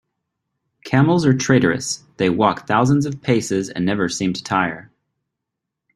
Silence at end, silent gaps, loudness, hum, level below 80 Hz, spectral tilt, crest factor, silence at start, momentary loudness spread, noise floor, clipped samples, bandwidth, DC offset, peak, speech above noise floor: 1.15 s; none; -19 LUFS; none; -54 dBFS; -5.5 dB/octave; 20 dB; 0.85 s; 7 LU; -81 dBFS; under 0.1%; 12.5 kHz; under 0.1%; 0 dBFS; 63 dB